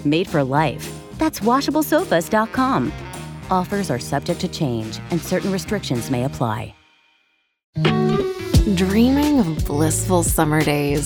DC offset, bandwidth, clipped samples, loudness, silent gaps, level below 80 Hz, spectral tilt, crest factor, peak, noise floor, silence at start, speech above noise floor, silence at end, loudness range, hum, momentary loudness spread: under 0.1%; over 20 kHz; under 0.1%; -20 LUFS; 7.64-7.73 s; -34 dBFS; -5.5 dB/octave; 18 dB; -2 dBFS; -64 dBFS; 0 s; 45 dB; 0 s; 6 LU; none; 8 LU